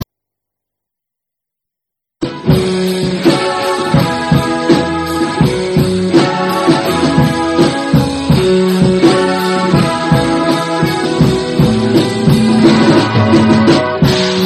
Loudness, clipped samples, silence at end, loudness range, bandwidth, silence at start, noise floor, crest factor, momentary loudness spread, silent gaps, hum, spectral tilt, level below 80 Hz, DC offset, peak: -11 LUFS; 0.2%; 0 s; 5 LU; 14 kHz; 0 s; -81 dBFS; 12 dB; 5 LU; none; none; -6 dB/octave; -34 dBFS; under 0.1%; 0 dBFS